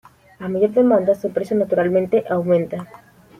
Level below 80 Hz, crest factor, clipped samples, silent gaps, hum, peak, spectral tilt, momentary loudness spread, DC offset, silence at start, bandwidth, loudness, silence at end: -60 dBFS; 14 dB; under 0.1%; none; none; -4 dBFS; -9 dB/octave; 12 LU; under 0.1%; 0.4 s; 14 kHz; -19 LUFS; 0.55 s